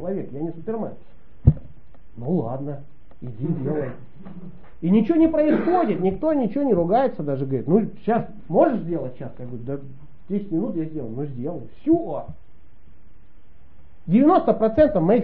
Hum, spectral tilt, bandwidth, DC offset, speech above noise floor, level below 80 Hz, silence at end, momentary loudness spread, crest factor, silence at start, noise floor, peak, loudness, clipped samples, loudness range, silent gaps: none; -9 dB/octave; 4.6 kHz; 2%; 29 dB; -40 dBFS; 0 s; 17 LU; 22 dB; 0 s; -51 dBFS; 0 dBFS; -22 LUFS; under 0.1%; 8 LU; none